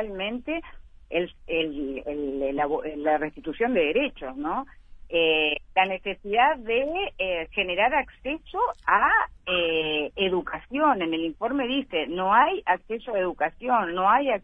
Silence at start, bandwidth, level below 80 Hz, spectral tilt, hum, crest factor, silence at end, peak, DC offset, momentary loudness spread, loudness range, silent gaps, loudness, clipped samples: 0 s; 3.8 kHz; -50 dBFS; -6.5 dB/octave; none; 20 dB; 0.05 s; -6 dBFS; under 0.1%; 10 LU; 3 LU; none; -25 LUFS; under 0.1%